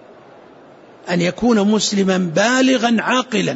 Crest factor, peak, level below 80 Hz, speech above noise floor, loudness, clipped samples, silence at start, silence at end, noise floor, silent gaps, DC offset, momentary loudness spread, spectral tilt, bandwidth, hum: 14 dB; -4 dBFS; -54 dBFS; 27 dB; -16 LUFS; under 0.1%; 1.05 s; 0 s; -43 dBFS; none; under 0.1%; 5 LU; -4.5 dB/octave; 8 kHz; none